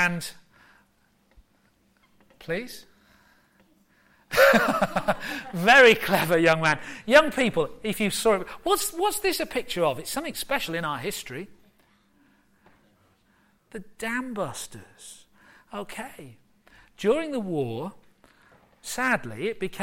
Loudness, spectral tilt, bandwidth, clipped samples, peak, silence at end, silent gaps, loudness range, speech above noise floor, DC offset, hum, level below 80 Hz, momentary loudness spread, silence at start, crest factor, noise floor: -24 LUFS; -3.5 dB/octave; 16.5 kHz; under 0.1%; -4 dBFS; 0 s; none; 18 LU; 41 dB; under 0.1%; none; -54 dBFS; 22 LU; 0 s; 22 dB; -65 dBFS